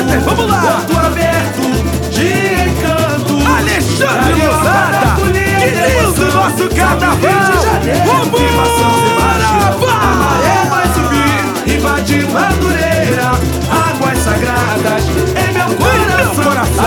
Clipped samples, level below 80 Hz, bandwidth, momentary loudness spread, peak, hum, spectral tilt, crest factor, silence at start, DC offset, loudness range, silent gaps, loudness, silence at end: under 0.1%; -22 dBFS; 19.5 kHz; 3 LU; 0 dBFS; none; -5 dB/octave; 12 dB; 0 s; under 0.1%; 2 LU; none; -11 LUFS; 0 s